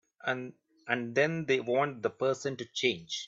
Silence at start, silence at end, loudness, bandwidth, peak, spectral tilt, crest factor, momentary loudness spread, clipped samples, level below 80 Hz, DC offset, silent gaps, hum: 0.25 s; 0 s; -31 LUFS; 7.8 kHz; -12 dBFS; -4.5 dB/octave; 20 dB; 8 LU; under 0.1%; -76 dBFS; under 0.1%; none; none